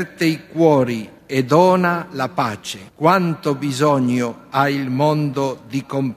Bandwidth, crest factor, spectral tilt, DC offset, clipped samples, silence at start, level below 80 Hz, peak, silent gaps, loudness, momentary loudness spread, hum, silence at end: 15.5 kHz; 18 dB; -6.5 dB/octave; under 0.1%; under 0.1%; 0 s; -58 dBFS; 0 dBFS; none; -18 LUFS; 9 LU; none; 0 s